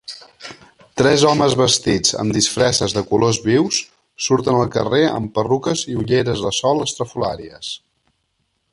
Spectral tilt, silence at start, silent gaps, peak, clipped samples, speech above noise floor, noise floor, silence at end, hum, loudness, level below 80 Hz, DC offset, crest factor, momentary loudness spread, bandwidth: -4 dB/octave; 0.1 s; none; -2 dBFS; under 0.1%; 52 dB; -69 dBFS; 0.95 s; none; -17 LUFS; -46 dBFS; under 0.1%; 18 dB; 16 LU; 11.5 kHz